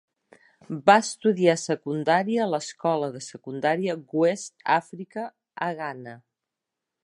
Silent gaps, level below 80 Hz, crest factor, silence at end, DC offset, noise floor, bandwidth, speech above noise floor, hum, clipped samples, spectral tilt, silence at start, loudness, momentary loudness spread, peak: none; -78 dBFS; 22 dB; 0.85 s; under 0.1%; -86 dBFS; 11.5 kHz; 61 dB; none; under 0.1%; -5 dB/octave; 0.7 s; -25 LUFS; 17 LU; -2 dBFS